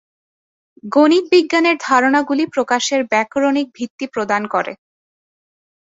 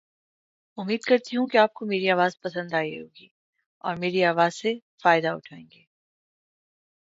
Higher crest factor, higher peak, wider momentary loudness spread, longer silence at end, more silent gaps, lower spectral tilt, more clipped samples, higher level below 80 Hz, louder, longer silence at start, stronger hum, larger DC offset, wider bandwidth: second, 16 dB vs 22 dB; about the same, -2 dBFS vs -4 dBFS; about the same, 11 LU vs 13 LU; second, 1.25 s vs 1.45 s; second, 3.90-3.99 s vs 3.31-3.53 s, 3.66-3.81 s, 4.82-4.98 s; second, -3 dB/octave vs -5.5 dB/octave; neither; first, -64 dBFS vs -74 dBFS; first, -16 LUFS vs -24 LUFS; about the same, 0.85 s vs 0.75 s; neither; neither; about the same, 8 kHz vs 7.8 kHz